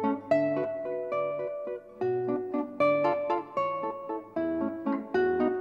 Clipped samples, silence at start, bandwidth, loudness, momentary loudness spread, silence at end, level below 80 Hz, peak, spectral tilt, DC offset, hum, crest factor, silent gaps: under 0.1%; 0 s; 7.4 kHz; -30 LUFS; 8 LU; 0 s; -70 dBFS; -14 dBFS; -8 dB/octave; under 0.1%; none; 16 dB; none